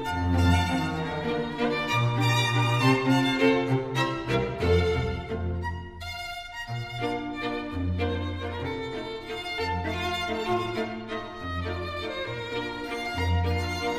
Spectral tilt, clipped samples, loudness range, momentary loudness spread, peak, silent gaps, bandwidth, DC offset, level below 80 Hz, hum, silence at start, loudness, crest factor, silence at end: -6 dB/octave; under 0.1%; 7 LU; 11 LU; -8 dBFS; none; 15.5 kHz; under 0.1%; -42 dBFS; none; 0 s; -28 LUFS; 20 dB; 0 s